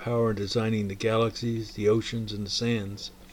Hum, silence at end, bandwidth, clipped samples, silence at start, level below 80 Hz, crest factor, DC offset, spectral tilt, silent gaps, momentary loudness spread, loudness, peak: none; 0 s; 16.5 kHz; under 0.1%; 0 s; -50 dBFS; 16 dB; under 0.1%; -5.5 dB/octave; none; 7 LU; -28 LUFS; -12 dBFS